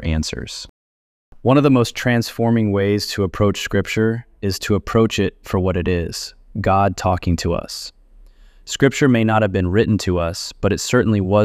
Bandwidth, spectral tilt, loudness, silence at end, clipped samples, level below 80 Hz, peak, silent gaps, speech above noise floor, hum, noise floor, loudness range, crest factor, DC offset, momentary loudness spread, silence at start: 15 kHz; -6 dB/octave; -18 LUFS; 0 s; under 0.1%; -38 dBFS; -2 dBFS; 0.69-1.32 s; 28 dB; none; -45 dBFS; 3 LU; 16 dB; under 0.1%; 11 LU; 0 s